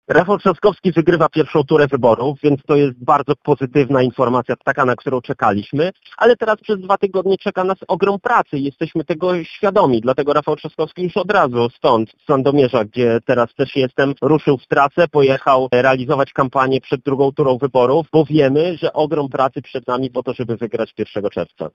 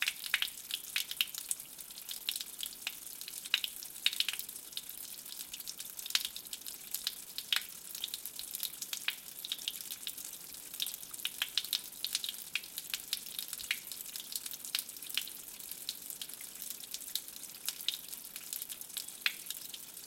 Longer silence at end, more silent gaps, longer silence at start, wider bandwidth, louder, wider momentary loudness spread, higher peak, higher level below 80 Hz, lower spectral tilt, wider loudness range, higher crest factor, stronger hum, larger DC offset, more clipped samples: about the same, 0.05 s vs 0 s; neither; about the same, 0.1 s vs 0 s; second, 7.4 kHz vs 17 kHz; first, -16 LUFS vs -38 LUFS; about the same, 8 LU vs 9 LU; first, -2 dBFS vs -10 dBFS; first, -54 dBFS vs -78 dBFS; first, -8 dB/octave vs 2.5 dB/octave; about the same, 3 LU vs 3 LU; second, 14 dB vs 32 dB; neither; neither; neither